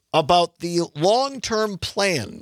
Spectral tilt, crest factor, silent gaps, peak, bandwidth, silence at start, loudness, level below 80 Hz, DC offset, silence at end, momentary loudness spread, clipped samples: -4 dB/octave; 18 dB; none; -4 dBFS; 15 kHz; 0.15 s; -21 LUFS; -52 dBFS; under 0.1%; 0 s; 7 LU; under 0.1%